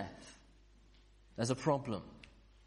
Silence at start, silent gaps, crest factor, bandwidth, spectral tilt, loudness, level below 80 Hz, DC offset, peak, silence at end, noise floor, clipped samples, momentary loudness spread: 0 s; none; 24 dB; 11 kHz; -5.5 dB/octave; -37 LUFS; -64 dBFS; under 0.1%; -18 dBFS; 0.4 s; -63 dBFS; under 0.1%; 23 LU